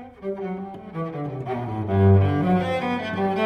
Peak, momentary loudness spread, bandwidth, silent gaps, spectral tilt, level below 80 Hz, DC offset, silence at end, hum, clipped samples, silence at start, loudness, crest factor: -6 dBFS; 14 LU; 5.8 kHz; none; -9 dB/octave; -52 dBFS; under 0.1%; 0 s; none; under 0.1%; 0 s; -23 LUFS; 16 dB